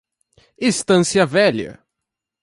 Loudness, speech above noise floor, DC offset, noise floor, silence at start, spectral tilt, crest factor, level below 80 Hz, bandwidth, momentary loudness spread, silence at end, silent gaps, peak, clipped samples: -17 LUFS; 66 dB; under 0.1%; -82 dBFS; 0.6 s; -4.5 dB/octave; 18 dB; -56 dBFS; 11.5 kHz; 11 LU; 0.7 s; none; -2 dBFS; under 0.1%